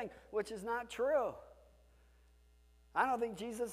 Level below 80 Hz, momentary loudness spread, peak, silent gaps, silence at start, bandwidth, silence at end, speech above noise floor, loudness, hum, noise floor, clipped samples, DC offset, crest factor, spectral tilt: -66 dBFS; 7 LU; -20 dBFS; none; 0 s; 15.5 kHz; 0 s; 29 dB; -38 LUFS; none; -66 dBFS; under 0.1%; under 0.1%; 20 dB; -4 dB/octave